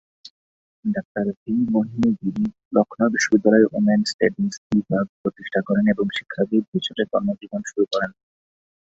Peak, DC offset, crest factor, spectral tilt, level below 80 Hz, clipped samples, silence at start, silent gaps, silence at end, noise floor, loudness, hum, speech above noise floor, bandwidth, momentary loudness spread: -2 dBFS; under 0.1%; 20 dB; -5.5 dB/octave; -58 dBFS; under 0.1%; 0.85 s; 1.05-1.15 s, 1.37-1.46 s, 2.65-2.71 s, 4.14-4.19 s, 4.57-4.70 s, 5.09-5.24 s, 6.68-6.72 s; 0.7 s; under -90 dBFS; -22 LUFS; none; over 69 dB; 7.8 kHz; 9 LU